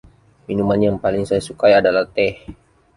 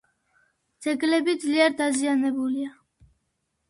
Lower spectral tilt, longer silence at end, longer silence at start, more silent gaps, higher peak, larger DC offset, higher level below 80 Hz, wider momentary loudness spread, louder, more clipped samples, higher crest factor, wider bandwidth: first, -6.5 dB/octave vs -2.5 dB/octave; second, 0.45 s vs 1 s; second, 0.5 s vs 0.8 s; neither; first, -2 dBFS vs -6 dBFS; neither; first, -46 dBFS vs -70 dBFS; about the same, 8 LU vs 10 LU; first, -17 LUFS vs -24 LUFS; neither; about the same, 16 dB vs 20 dB; about the same, 11.5 kHz vs 11.5 kHz